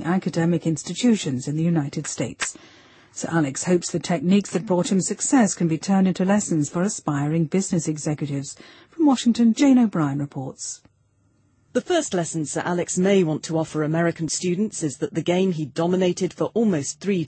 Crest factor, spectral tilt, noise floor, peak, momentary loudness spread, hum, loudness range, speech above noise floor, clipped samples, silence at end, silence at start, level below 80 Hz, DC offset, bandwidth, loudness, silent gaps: 14 dB; -5.5 dB/octave; -63 dBFS; -8 dBFS; 10 LU; none; 3 LU; 41 dB; under 0.1%; 0 s; 0 s; -62 dBFS; under 0.1%; 8.8 kHz; -22 LUFS; none